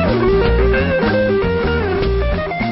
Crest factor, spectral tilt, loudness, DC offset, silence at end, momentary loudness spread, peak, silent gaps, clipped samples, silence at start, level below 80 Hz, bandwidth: 12 dB; -11.5 dB/octave; -16 LUFS; under 0.1%; 0 s; 4 LU; -4 dBFS; none; under 0.1%; 0 s; -22 dBFS; 5.8 kHz